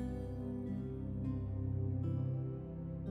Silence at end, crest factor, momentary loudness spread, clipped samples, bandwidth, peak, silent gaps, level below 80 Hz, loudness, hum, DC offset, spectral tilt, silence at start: 0 s; 12 dB; 6 LU; under 0.1%; 3.5 kHz; -28 dBFS; none; -50 dBFS; -40 LUFS; none; under 0.1%; -11 dB/octave; 0 s